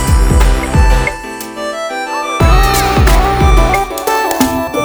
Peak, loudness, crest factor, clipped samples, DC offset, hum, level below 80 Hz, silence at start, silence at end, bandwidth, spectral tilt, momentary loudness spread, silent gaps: 0 dBFS; -12 LUFS; 10 dB; under 0.1%; under 0.1%; none; -14 dBFS; 0 s; 0 s; over 20 kHz; -5 dB/octave; 9 LU; none